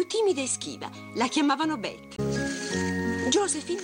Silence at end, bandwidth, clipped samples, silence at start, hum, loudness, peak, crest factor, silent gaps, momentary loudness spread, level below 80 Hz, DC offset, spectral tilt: 0 s; 16.5 kHz; under 0.1%; 0 s; none; -27 LUFS; -12 dBFS; 16 dB; none; 10 LU; -56 dBFS; under 0.1%; -3.5 dB/octave